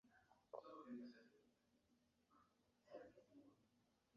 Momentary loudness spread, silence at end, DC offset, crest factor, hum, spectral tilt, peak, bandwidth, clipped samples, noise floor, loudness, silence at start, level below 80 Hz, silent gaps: 6 LU; 0 s; under 0.1%; 24 dB; none; -4.5 dB/octave; -40 dBFS; 6.8 kHz; under 0.1%; -83 dBFS; -61 LUFS; 0.05 s; under -90 dBFS; none